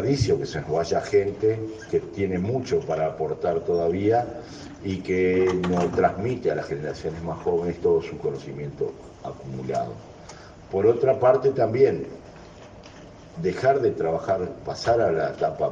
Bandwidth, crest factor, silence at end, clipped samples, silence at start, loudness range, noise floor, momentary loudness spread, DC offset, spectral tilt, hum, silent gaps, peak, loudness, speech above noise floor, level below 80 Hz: 8 kHz; 18 dB; 0 s; under 0.1%; 0 s; 5 LU; -44 dBFS; 18 LU; under 0.1%; -7 dB/octave; none; none; -6 dBFS; -24 LUFS; 21 dB; -52 dBFS